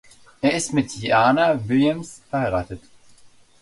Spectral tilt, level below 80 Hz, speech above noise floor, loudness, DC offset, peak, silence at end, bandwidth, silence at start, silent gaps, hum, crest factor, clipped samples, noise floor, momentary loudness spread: -5 dB/octave; -50 dBFS; 29 dB; -21 LUFS; under 0.1%; -4 dBFS; 0.35 s; 11.5 kHz; 0.45 s; none; none; 18 dB; under 0.1%; -50 dBFS; 12 LU